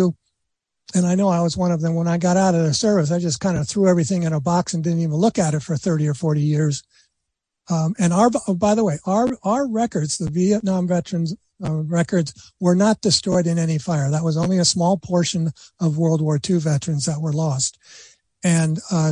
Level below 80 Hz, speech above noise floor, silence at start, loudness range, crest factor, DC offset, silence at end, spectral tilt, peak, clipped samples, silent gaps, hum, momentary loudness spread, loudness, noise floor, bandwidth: -54 dBFS; 60 dB; 0 s; 3 LU; 16 dB; under 0.1%; 0 s; -5.5 dB/octave; -4 dBFS; under 0.1%; none; none; 6 LU; -20 LUFS; -79 dBFS; 10.5 kHz